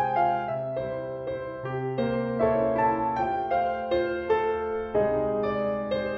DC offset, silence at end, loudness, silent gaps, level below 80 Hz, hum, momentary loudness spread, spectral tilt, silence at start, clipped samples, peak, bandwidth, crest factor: under 0.1%; 0 s; -27 LUFS; none; -52 dBFS; none; 8 LU; -8.5 dB/octave; 0 s; under 0.1%; -12 dBFS; 6 kHz; 14 dB